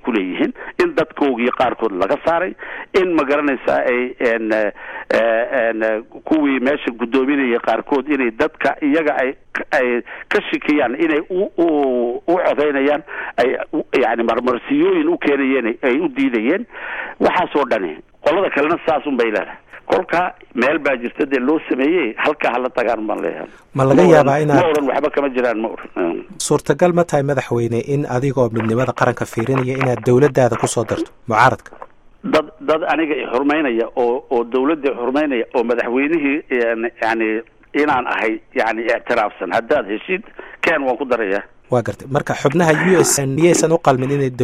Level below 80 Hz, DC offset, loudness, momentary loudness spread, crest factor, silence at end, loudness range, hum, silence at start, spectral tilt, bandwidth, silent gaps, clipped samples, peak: -50 dBFS; under 0.1%; -17 LUFS; 8 LU; 18 dB; 0 s; 3 LU; none; 0.05 s; -5.5 dB/octave; 15 kHz; none; under 0.1%; 0 dBFS